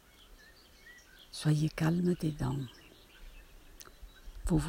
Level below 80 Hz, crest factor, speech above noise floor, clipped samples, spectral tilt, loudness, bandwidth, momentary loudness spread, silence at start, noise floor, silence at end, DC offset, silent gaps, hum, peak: -48 dBFS; 18 dB; 27 dB; under 0.1%; -6.5 dB/octave; -33 LUFS; 16 kHz; 25 LU; 0.3 s; -58 dBFS; 0 s; under 0.1%; none; none; -16 dBFS